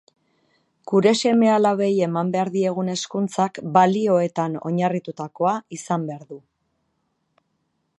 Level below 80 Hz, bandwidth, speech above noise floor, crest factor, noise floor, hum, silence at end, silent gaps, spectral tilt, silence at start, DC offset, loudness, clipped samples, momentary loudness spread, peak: -72 dBFS; 11.5 kHz; 51 dB; 20 dB; -72 dBFS; none; 1.6 s; none; -6 dB/octave; 0.85 s; under 0.1%; -21 LUFS; under 0.1%; 10 LU; -2 dBFS